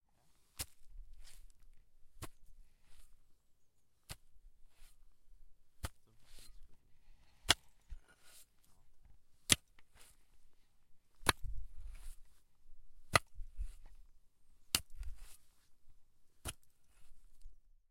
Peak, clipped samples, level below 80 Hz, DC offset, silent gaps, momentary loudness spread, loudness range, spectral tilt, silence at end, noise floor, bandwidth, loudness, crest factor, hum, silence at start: -6 dBFS; under 0.1%; -54 dBFS; under 0.1%; none; 27 LU; 21 LU; -1.5 dB/octave; 0.1 s; -72 dBFS; 16.5 kHz; -37 LUFS; 38 dB; none; 0.55 s